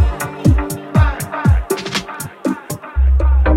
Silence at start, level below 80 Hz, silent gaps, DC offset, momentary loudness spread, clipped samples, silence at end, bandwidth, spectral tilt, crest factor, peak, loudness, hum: 0 s; -18 dBFS; none; under 0.1%; 8 LU; under 0.1%; 0 s; 16 kHz; -6 dB/octave; 14 dB; 0 dBFS; -17 LUFS; none